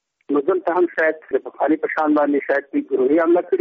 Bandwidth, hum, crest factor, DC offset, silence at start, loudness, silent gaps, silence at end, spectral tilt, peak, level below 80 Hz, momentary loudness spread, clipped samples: 5.2 kHz; none; 12 dB; under 0.1%; 0.3 s; -19 LUFS; none; 0 s; -4 dB/octave; -6 dBFS; -70 dBFS; 6 LU; under 0.1%